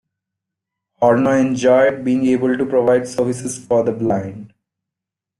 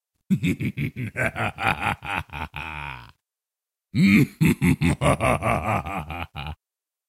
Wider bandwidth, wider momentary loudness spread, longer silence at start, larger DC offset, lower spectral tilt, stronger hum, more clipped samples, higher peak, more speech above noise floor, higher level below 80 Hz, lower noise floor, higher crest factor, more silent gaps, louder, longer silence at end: second, 12 kHz vs 16 kHz; second, 7 LU vs 16 LU; first, 1 s vs 0.3 s; neither; about the same, -6 dB/octave vs -6.5 dB/octave; neither; neither; about the same, -2 dBFS vs -4 dBFS; about the same, 69 dB vs 67 dB; second, -56 dBFS vs -42 dBFS; second, -85 dBFS vs -89 dBFS; about the same, 16 dB vs 20 dB; neither; first, -17 LUFS vs -24 LUFS; first, 0.95 s vs 0.55 s